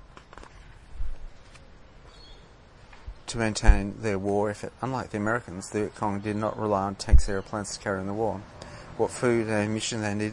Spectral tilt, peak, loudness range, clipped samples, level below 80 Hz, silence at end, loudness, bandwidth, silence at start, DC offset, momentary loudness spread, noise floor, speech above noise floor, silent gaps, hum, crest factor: -5.5 dB/octave; -2 dBFS; 5 LU; under 0.1%; -32 dBFS; 0 s; -28 LUFS; 11 kHz; 0.35 s; under 0.1%; 23 LU; -51 dBFS; 26 dB; none; none; 24 dB